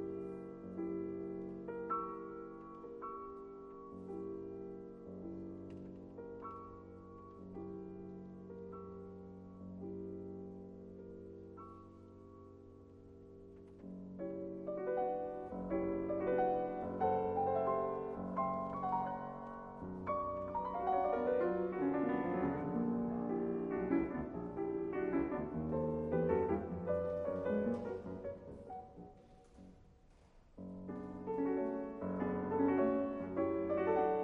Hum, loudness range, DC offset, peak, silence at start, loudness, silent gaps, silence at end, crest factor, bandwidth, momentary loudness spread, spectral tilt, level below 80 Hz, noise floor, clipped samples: none; 14 LU; under 0.1%; -20 dBFS; 0 s; -39 LUFS; none; 0 s; 20 dB; 5.8 kHz; 18 LU; -10 dB/octave; -64 dBFS; -64 dBFS; under 0.1%